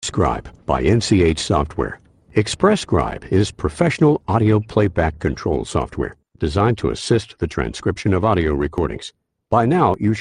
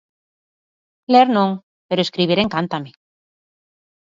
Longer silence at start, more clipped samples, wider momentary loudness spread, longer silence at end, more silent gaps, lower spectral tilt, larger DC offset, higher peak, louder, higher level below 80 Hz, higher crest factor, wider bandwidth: second, 0 s vs 1.1 s; neither; second, 9 LU vs 17 LU; second, 0 s vs 1.25 s; second, none vs 1.63-1.89 s; about the same, -6 dB/octave vs -6.5 dB/octave; neither; about the same, -2 dBFS vs -2 dBFS; about the same, -19 LUFS vs -18 LUFS; first, -36 dBFS vs -58 dBFS; about the same, 16 dB vs 20 dB; first, 11 kHz vs 7.6 kHz